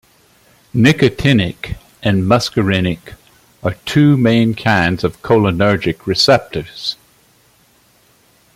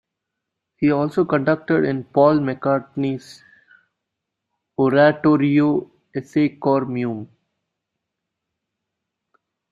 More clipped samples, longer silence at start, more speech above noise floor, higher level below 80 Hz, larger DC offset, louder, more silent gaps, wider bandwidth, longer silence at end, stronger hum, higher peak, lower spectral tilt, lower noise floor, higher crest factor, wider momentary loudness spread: neither; about the same, 0.75 s vs 0.8 s; second, 39 dB vs 63 dB; first, -42 dBFS vs -62 dBFS; neither; first, -15 LUFS vs -19 LUFS; neither; first, 16 kHz vs 7.4 kHz; second, 1.6 s vs 2.45 s; neither; about the same, 0 dBFS vs -2 dBFS; second, -6 dB/octave vs -8.5 dB/octave; second, -53 dBFS vs -81 dBFS; about the same, 16 dB vs 18 dB; about the same, 12 LU vs 12 LU